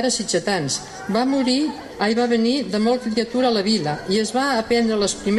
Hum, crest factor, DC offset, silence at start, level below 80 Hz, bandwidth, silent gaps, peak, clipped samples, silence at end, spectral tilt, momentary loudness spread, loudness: none; 14 dB; under 0.1%; 0 s; -52 dBFS; 12 kHz; none; -8 dBFS; under 0.1%; 0 s; -4 dB/octave; 4 LU; -20 LUFS